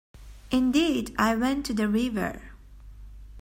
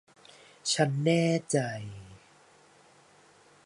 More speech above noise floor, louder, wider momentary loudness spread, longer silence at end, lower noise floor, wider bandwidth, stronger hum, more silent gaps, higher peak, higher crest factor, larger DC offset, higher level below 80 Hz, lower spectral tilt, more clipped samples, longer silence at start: second, 21 dB vs 32 dB; about the same, -26 LUFS vs -28 LUFS; second, 8 LU vs 17 LU; second, 0 s vs 1.5 s; second, -46 dBFS vs -59 dBFS; first, 16 kHz vs 11.5 kHz; neither; neither; first, -8 dBFS vs -12 dBFS; about the same, 18 dB vs 20 dB; neither; first, -46 dBFS vs -68 dBFS; about the same, -5 dB/octave vs -5 dB/octave; neither; second, 0.15 s vs 0.65 s